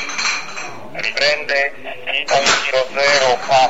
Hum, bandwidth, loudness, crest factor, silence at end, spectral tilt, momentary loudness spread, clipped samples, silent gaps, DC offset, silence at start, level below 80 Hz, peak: none; 15.5 kHz; -16 LUFS; 18 dB; 0 s; -1 dB/octave; 13 LU; under 0.1%; none; 3%; 0 s; -54 dBFS; 0 dBFS